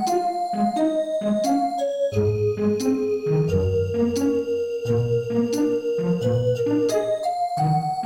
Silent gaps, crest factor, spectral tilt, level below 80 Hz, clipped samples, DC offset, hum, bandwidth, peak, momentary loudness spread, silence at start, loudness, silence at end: none; 12 dB; -7 dB/octave; -52 dBFS; under 0.1%; under 0.1%; none; 17 kHz; -10 dBFS; 3 LU; 0 s; -23 LUFS; 0 s